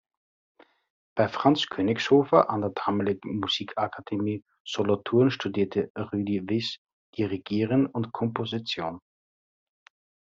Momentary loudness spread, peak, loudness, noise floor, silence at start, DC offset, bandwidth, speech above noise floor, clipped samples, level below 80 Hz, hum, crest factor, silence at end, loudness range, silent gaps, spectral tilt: 10 LU; -4 dBFS; -27 LUFS; under -90 dBFS; 1.15 s; under 0.1%; 7.6 kHz; over 64 dB; under 0.1%; -68 dBFS; none; 22 dB; 1.35 s; 5 LU; 4.60-4.65 s, 5.90-5.95 s, 6.78-6.85 s, 6.93-7.13 s; -4.5 dB/octave